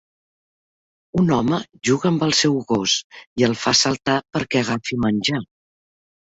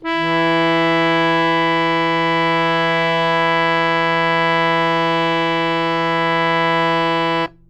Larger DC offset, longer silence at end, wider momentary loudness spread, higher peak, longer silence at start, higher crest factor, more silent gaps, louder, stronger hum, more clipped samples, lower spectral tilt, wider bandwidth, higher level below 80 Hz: neither; first, 0.85 s vs 0.2 s; first, 6 LU vs 2 LU; about the same, -4 dBFS vs -4 dBFS; first, 1.15 s vs 0 s; about the same, 18 dB vs 14 dB; first, 3.04-3.10 s, 3.27-3.36 s vs none; second, -20 LUFS vs -16 LUFS; neither; neither; second, -4 dB/octave vs -5.5 dB/octave; second, 8.2 kHz vs 9.2 kHz; about the same, -52 dBFS vs -52 dBFS